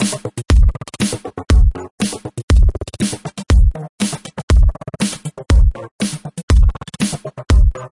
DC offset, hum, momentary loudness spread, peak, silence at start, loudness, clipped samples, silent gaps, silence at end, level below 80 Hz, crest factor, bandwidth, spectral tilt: under 0.1%; none; 9 LU; -2 dBFS; 0 s; -18 LUFS; under 0.1%; 1.91-1.98 s, 2.43-2.48 s, 3.89-3.98 s, 4.43-4.48 s, 5.91-5.99 s, 6.43-6.48 s; 0.1 s; -16 dBFS; 12 dB; 11.5 kHz; -5.5 dB/octave